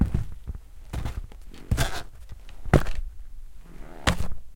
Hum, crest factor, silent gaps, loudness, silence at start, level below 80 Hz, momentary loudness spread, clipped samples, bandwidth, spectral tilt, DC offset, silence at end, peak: none; 26 dB; none; -29 LUFS; 0 s; -32 dBFS; 24 LU; under 0.1%; 17 kHz; -5.5 dB/octave; 0.2%; 0 s; -2 dBFS